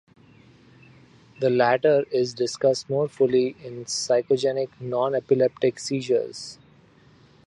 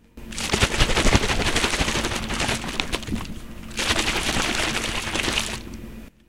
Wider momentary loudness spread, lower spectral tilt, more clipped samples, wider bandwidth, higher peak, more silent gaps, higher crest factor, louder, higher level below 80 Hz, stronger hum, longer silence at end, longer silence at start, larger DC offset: second, 9 LU vs 14 LU; first, -4.5 dB/octave vs -3 dB/octave; neither; second, 11 kHz vs 16.5 kHz; second, -6 dBFS vs 0 dBFS; neither; second, 18 dB vs 24 dB; about the same, -23 LUFS vs -23 LUFS; second, -68 dBFS vs -30 dBFS; neither; first, 0.9 s vs 0 s; first, 1.4 s vs 0 s; second, under 0.1% vs 0.5%